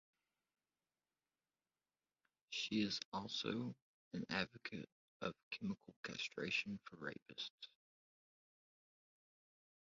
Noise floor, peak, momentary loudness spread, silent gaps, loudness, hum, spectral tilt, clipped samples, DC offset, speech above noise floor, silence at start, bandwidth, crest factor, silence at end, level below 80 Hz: under -90 dBFS; -24 dBFS; 11 LU; 3.05-3.12 s, 3.82-4.11 s, 4.92-5.20 s, 5.43-5.51 s, 5.96-6.03 s, 7.22-7.26 s, 7.50-7.58 s; -45 LUFS; none; -2.5 dB/octave; under 0.1%; under 0.1%; over 44 dB; 2.5 s; 7.4 kHz; 26 dB; 2.15 s; -80 dBFS